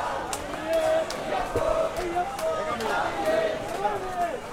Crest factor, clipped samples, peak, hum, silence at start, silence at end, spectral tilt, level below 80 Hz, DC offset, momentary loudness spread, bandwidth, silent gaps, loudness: 16 dB; under 0.1%; -10 dBFS; none; 0 s; 0 s; -4 dB/octave; -46 dBFS; under 0.1%; 4 LU; 16.5 kHz; none; -27 LUFS